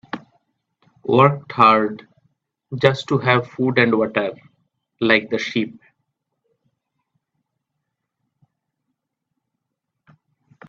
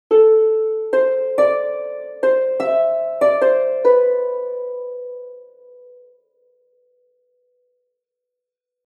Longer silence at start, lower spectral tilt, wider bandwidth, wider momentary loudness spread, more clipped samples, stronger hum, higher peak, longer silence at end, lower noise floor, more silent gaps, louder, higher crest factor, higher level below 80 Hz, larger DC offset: about the same, 0.15 s vs 0.1 s; first, -7 dB/octave vs -5.5 dB/octave; second, 7.8 kHz vs 8.8 kHz; about the same, 17 LU vs 15 LU; neither; neither; about the same, 0 dBFS vs -2 dBFS; first, 4.95 s vs 3.45 s; second, -79 dBFS vs -83 dBFS; neither; about the same, -18 LUFS vs -17 LUFS; first, 22 dB vs 16 dB; first, -62 dBFS vs -82 dBFS; neither